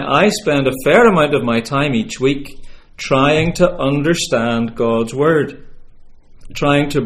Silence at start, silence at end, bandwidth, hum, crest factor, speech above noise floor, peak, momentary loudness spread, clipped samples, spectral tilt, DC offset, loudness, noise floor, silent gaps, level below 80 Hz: 0 s; 0 s; 15.5 kHz; none; 16 dB; 24 dB; 0 dBFS; 8 LU; under 0.1%; -5.5 dB/octave; under 0.1%; -15 LUFS; -38 dBFS; none; -36 dBFS